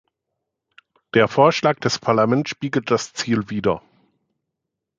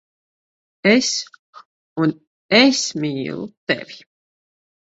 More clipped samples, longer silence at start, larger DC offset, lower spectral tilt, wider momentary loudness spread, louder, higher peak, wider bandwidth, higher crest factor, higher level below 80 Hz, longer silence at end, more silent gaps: neither; first, 1.15 s vs 0.85 s; neither; first, -5 dB/octave vs -3.5 dB/octave; second, 8 LU vs 16 LU; about the same, -20 LUFS vs -18 LUFS; about the same, -2 dBFS vs 0 dBFS; first, 9.2 kHz vs 8 kHz; about the same, 20 dB vs 20 dB; first, -58 dBFS vs -64 dBFS; first, 1.2 s vs 1 s; second, none vs 1.39-1.53 s, 1.65-1.96 s, 2.27-2.49 s, 3.57-3.67 s